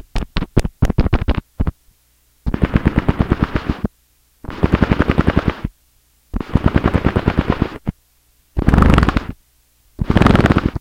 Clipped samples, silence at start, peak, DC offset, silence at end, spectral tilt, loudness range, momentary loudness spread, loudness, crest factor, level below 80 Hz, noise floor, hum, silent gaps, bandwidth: 0.2%; 0.15 s; 0 dBFS; under 0.1%; 0 s; -8 dB/octave; 3 LU; 16 LU; -17 LUFS; 16 dB; -22 dBFS; -57 dBFS; 60 Hz at -40 dBFS; none; 15 kHz